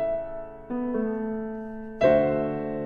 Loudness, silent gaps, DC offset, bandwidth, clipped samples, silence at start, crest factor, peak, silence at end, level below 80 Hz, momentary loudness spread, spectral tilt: -26 LUFS; none; under 0.1%; 6.6 kHz; under 0.1%; 0 s; 18 dB; -8 dBFS; 0 s; -50 dBFS; 16 LU; -8.5 dB/octave